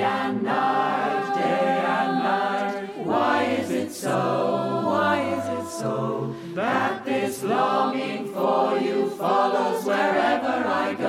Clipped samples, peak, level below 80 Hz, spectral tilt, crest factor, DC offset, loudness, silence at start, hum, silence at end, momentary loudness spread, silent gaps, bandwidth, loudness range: under 0.1%; -8 dBFS; -72 dBFS; -5 dB/octave; 14 dB; under 0.1%; -24 LUFS; 0 s; none; 0 s; 6 LU; none; 16 kHz; 2 LU